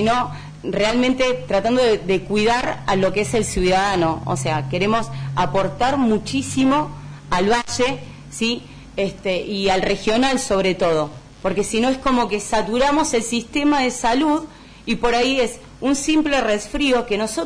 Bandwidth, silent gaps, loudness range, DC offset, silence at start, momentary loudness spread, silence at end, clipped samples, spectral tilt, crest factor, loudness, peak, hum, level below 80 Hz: 11 kHz; none; 2 LU; under 0.1%; 0 s; 8 LU; 0 s; under 0.1%; -4.5 dB/octave; 12 dB; -20 LUFS; -8 dBFS; none; -40 dBFS